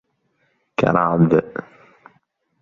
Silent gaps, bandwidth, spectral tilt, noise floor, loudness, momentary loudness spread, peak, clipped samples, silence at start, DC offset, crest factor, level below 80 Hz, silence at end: none; 7 kHz; -9 dB/octave; -67 dBFS; -18 LUFS; 17 LU; -2 dBFS; under 0.1%; 0.8 s; under 0.1%; 20 dB; -54 dBFS; 1 s